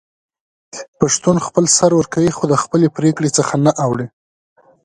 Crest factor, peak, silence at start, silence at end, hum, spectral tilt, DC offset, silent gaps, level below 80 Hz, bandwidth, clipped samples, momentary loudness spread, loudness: 16 dB; 0 dBFS; 0.75 s; 0.75 s; none; -5 dB/octave; under 0.1%; 0.88-0.93 s; -50 dBFS; 11.5 kHz; under 0.1%; 15 LU; -15 LUFS